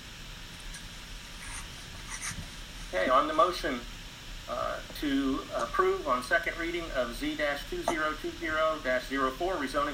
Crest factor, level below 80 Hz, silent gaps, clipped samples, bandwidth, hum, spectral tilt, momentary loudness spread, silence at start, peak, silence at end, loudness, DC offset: 20 dB; -46 dBFS; none; under 0.1%; 16 kHz; none; -3.5 dB/octave; 17 LU; 0 s; -12 dBFS; 0 s; -31 LUFS; under 0.1%